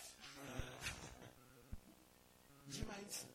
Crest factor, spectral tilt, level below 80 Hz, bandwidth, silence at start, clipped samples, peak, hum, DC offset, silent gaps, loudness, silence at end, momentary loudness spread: 22 dB; -3 dB/octave; -60 dBFS; 16.5 kHz; 0 s; under 0.1%; -32 dBFS; none; under 0.1%; none; -52 LUFS; 0 s; 18 LU